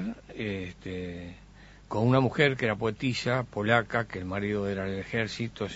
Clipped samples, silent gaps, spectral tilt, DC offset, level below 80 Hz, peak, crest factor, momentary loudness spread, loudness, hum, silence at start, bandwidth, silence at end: under 0.1%; none; -6.5 dB/octave; under 0.1%; -54 dBFS; -6 dBFS; 24 dB; 13 LU; -29 LUFS; none; 0 s; 8 kHz; 0 s